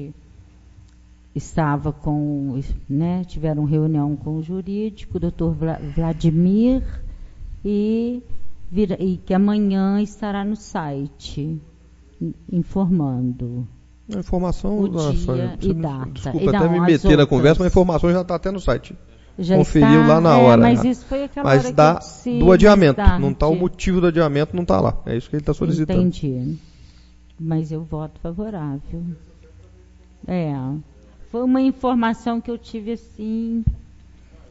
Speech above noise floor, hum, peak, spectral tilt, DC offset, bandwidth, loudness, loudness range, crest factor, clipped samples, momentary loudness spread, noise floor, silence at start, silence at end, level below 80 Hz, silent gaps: 30 dB; none; 0 dBFS; -8 dB/octave; under 0.1%; 8 kHz; -19 LUFS; 10 LU; 18 dB; under 0.1%; 16 LU; -48 dBFS; 0 s; 0.7 s; -32 dBFS; none